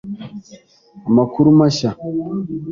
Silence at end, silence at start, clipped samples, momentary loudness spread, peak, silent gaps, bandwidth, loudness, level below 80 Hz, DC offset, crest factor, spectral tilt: 0 s; 0.05 s; under 0.1%; 19 LU; -2 dBFS; none; 7.4 kHz; -16 LUFS; -52 dBFS; under 0.1%; 14 dB; -7.5 dB/octave